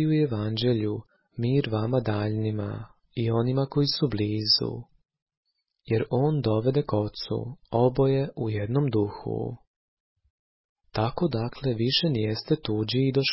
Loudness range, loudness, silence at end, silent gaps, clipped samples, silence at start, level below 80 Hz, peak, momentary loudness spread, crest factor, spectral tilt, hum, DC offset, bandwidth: 3 LU; -26 LUFS; 0 s; 5.22-5.26 s, 5.37-5.43 s, 9.67-10.16 s, 10.30-10.76 s; under 0.1%; 0 s; -52 dBFS; -10 dBFS; 10 LU; 18 dB; -10 dB/octave; none; under 0.1%; 5.8 kHz